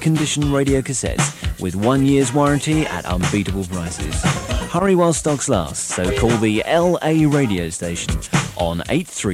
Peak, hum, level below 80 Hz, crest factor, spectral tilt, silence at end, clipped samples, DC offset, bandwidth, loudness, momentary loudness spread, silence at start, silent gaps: -2 dBFS; none; -32 dBFS; 16 dB; -5 dB/octave; 0 s; under 0.1%; under 0.1%; 16 kHz; -19 LUFS; 8 LU; 0 s; none